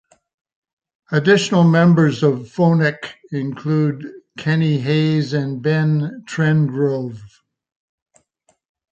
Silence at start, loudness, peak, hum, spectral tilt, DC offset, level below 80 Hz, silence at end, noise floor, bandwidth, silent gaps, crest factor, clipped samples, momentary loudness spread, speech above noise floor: 1.1 s; -17 LUFS; -2 dBFS; none; -7 dB/octave; under 0.1%; -62 dBFS; 1.65 s; -64 dBFS; 8 kHz; none; 16 dB; under 0.1%; 13 LU; 47 dB